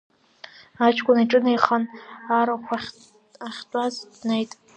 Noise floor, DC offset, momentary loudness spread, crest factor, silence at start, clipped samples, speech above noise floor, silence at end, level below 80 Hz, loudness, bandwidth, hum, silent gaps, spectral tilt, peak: -47 dBFS; under 0.1%; 19 LU; 22 dB; 0.8 s; under 0.1%; 25 dB; 0.3 s; -70 dBFS; -22 LUFS; 9 kHz; none; none; -5 dB/octave; 0 dBFS